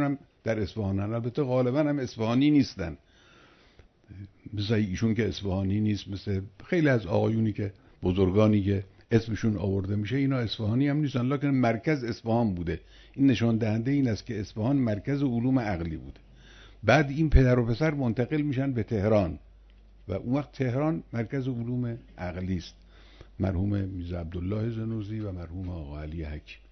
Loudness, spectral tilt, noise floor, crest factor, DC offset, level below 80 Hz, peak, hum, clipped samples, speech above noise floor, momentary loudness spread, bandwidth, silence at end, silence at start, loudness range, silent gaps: -28 LUFS; -8 dB/octave; -58 dBFS; 22 dB; under 0.1%; -42 dBFS; -6 dBFS; none; under 0.1%; 31 dB; 14 LU; 6.4 kHz; 0.15 s; 0 s; 6 LU; none